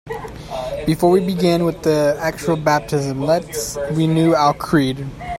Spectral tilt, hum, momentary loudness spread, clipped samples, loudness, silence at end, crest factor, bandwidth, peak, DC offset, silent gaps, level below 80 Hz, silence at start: -6 dB/octave; none; 11 LU; under 0.1%; -18 LUFS; 0 s; 16 dB; 16.5 kHz; -2 dBFS; under 0.1%; none; -42 dBFS; 0.05 s